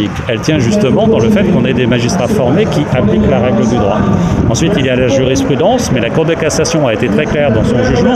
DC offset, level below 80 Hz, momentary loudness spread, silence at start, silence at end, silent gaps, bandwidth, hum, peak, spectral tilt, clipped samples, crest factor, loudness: under 0.1%; -30 dBFS; 2 LU; 0 s; 0 s; none; 14 kHz; none; -2 dBFS; -6 dB/octave; under 0.1%; 10 dB; -11 LUFS